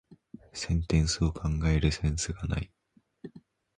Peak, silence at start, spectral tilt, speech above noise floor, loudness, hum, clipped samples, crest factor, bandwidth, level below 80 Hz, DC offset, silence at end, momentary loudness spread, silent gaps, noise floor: -12 dBFS; 0.1 s; -5 dB/octave; 27 dB; -29 LUFS; none; under 0.1%; 18 dB; 10.5 kHz; -36 dBFS; under 0.1%; 0.4 s; 22 LU; none; -55 dBFS